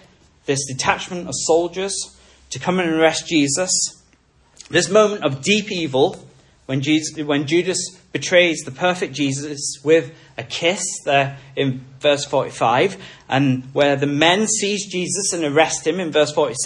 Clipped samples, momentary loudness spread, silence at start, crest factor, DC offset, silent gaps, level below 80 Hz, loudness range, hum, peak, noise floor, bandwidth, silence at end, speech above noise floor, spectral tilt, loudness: under 0.1%; 9 LU; 0.5 s; 18 dB; under 0.1%; none; -58 dBFS; 2 LU; none; 0 dBFS; -56 dBFS; 11.5 kHz; 0 s; 37 dB; -3.5 dB/octave; -19 LUFS